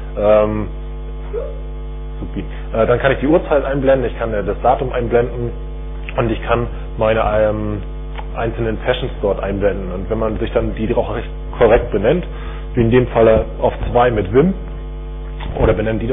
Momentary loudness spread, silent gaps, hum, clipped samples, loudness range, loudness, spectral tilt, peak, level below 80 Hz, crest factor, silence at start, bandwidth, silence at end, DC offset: 15 LU; none; none; under 0.1%; 4 LU; -17 LUFS; -11.5 dB/octave; -2 dBFS; -26 dBFS; 16 dB; 0 s; 3.8 kHz; 0 s; under 0.1%